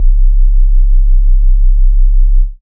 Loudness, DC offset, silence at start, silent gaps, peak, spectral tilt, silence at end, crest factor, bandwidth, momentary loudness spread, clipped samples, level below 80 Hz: -14 LUFS; under 0.1%; 0 s; none; 0 dBFS; -13.5 dB/octave; 0.05 s; 6 dB; 0.1 kHz; 0 LU; under 0.1%; -6 dBFS